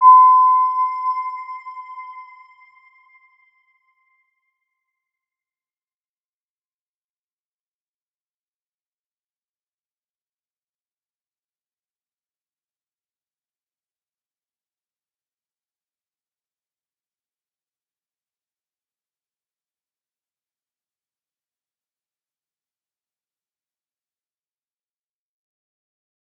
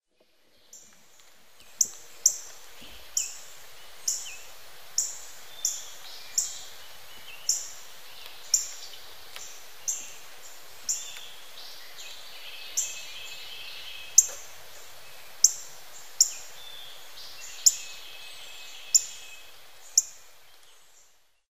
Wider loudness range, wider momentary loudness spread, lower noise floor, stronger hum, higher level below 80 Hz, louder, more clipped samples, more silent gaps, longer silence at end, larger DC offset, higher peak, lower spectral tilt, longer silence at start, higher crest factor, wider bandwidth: first, 26 LU vs 9 LU; about the same, 26 LU vs 24 LU; first, under -90 dBFS vs -66 dBFS; neither; second, under -90 dBFS vs -70 dBFS; first, -14 LUFS vs -27 LUFS; neither; neither; first, 24 s vs 0 s; second, under 0.1% vs 0.8%; about the same, -2 dBFS vs -2 dBFS; second, 6.5 dB/octave vs 3 dB/octave; about the same, 0 s vs 0 s; second, 24 dB vs 32 dB; second, 5.6 kHz vs 16 kHz